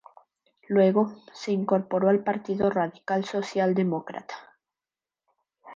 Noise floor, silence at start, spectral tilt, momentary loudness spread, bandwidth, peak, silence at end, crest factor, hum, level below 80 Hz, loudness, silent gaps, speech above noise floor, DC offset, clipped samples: under -90 dBFS; 0.7 s; -7.5 dB/octave; 15 LU; 7.6 kHz; -8 dBFS; 0 s; 18 dB; none; -68 dBFS; -25 LUFS; none; over 65 dB; under 0.1%; under 0.1%